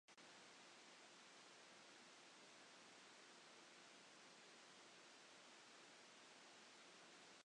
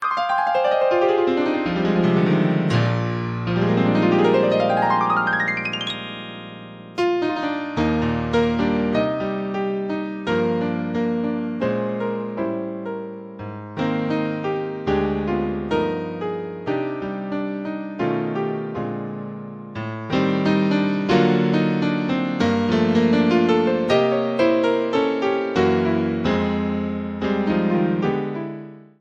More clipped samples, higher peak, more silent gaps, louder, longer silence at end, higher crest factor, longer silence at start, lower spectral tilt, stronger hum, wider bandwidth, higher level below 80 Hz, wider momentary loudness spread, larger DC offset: neither; second, -52 dBFS vs -4 dBFS; neither; second, -64 LUFS vs -21 LUFS; second, 0 s vs 0.15 s; about the same, 14 dB vs 16 dB; about the same, 0.1 s vs 0 s; second, -1 dB/octave vs -7.5 dB/octave; neither; first, 10 kHz vs 8.4 kHz; second, under -90 dBFS vs -48 dBFS; second, 0 LU vs 11 LU; neither